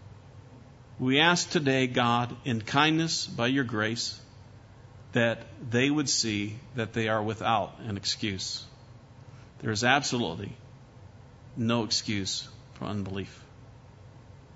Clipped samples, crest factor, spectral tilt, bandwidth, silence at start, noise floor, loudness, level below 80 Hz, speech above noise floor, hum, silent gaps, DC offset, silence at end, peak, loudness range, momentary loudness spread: under 0.1%; 24 dB; -4 dB/octave; 8 kHz; 0 s; -51 dBFS; -28 LUFS; -60 dBFS; 23 dB; none; none; under 0.1%; 0 s; -6 dBFS; 7 LU; 14 LU